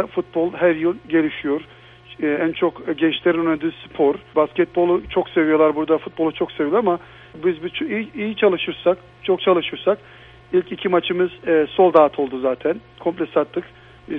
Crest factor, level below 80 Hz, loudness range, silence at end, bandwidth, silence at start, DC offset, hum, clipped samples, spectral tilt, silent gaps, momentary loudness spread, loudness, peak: 20 dB; -54 dBFS; 3 LU; 0 s; 4 kHz; 0 s; under 0.1%; none; under 0.1%; -8.5 dB/octave; none; 8 LU; -20 LUFS; 0 dBFS